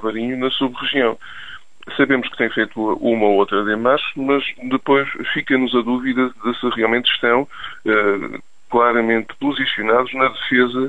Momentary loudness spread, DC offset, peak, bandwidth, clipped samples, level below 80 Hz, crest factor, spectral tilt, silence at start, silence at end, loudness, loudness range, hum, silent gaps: 8 LU; 1%; -2 dBFS; 8 kHz; under 0.1%; -54 dBFS; 16 dB; -6 dB/octave; 0 s; 0 s; -18 LUFS; 1 LU; none; none